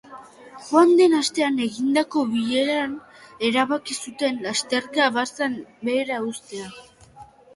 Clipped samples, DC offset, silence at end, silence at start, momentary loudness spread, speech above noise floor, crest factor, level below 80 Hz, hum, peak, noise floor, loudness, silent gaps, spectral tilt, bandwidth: under 0.1%; under 0.1%; 0.3 s; 0.1 s; 14 LU; 26 dB; 20 dB; -66 dBFS; none; -4 dBFS; -47 dBFS; -22 LUFS; none; -3 dB/octave; 11.5 kHz